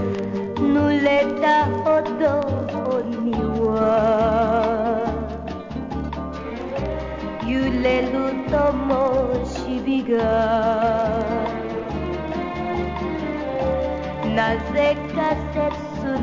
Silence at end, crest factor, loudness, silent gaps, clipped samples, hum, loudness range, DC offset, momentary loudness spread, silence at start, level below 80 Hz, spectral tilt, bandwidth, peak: 0 s; 16 dB; -22 LUFS; none; under 0.1%; none; 5 LU; 0.2%; 10 LU; 0 s; -36 dBFS; -7.5 dB/octave; 7.6 kHz; -6 dBFS